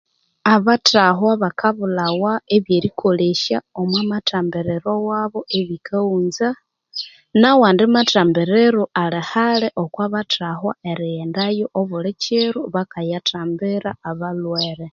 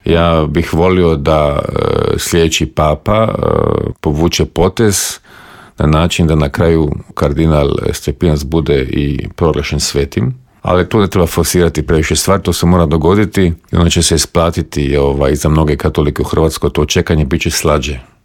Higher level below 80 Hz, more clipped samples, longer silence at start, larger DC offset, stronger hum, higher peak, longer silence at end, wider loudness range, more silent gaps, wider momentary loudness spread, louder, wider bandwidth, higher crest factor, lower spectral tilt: second, -60 dBFS vs -24 dBFS; neither; first, 0.45 s vs 0.05 s; neither; neither; about the same, 0 dBFS vs 0 dBFS; second, 0.05 s vs 0.25 s; first, 6 LU vs 2 LU; neither; first, 11 LU vs 5 LU; second, -18 LUFS vs -13 LUFS; second, 7.4 kHz vs 17.5 kHz; first, 18 dB vs 12 dB; about the same, -5.5 dB/octave vs -5.5 dB/octave